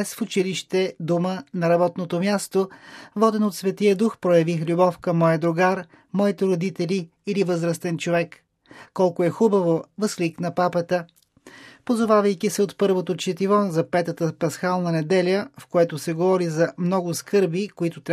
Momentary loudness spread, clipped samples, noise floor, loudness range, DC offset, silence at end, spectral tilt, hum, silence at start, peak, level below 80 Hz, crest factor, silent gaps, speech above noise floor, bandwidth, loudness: 7 LU; under 0.1%; -48 dBFS; 3 LU; under 0.1%; 0 s; -6 dB/octave; none; 0 s; -4 dBFS; -70 dBFS; 18 dB; none; 26 dB; 14.5 kHz; -22 LUFS